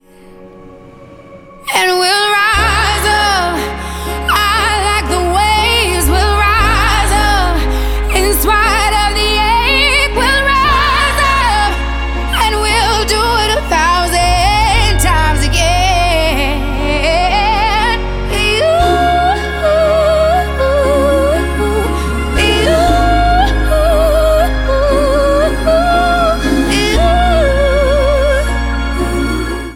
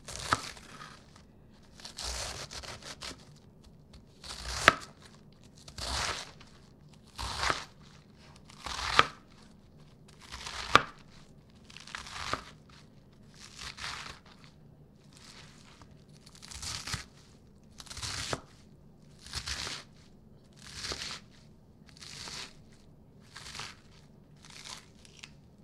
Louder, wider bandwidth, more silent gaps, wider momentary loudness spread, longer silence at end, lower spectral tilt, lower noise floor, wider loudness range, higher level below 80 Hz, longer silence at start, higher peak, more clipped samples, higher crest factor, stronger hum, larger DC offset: first, -12 LUFS vs -34 LUFS; about the same, 17 kHz vs 16 kHz; neither; second, 6 LU vs 28 LU; about the same, 0 s vs 0 s; first, -4 dB/octave vs -2 dB/octave; second, -37 dBFS vs -57 dBFS; second, 2 LU vs 14 LU; first, -18 dBFS vs -54 dBFS; first, 0.4 s vs 0 s; about the same, 0 dBFS vs 0 dBFS; neither; second, 12 dB vs 38 dB; neither; neither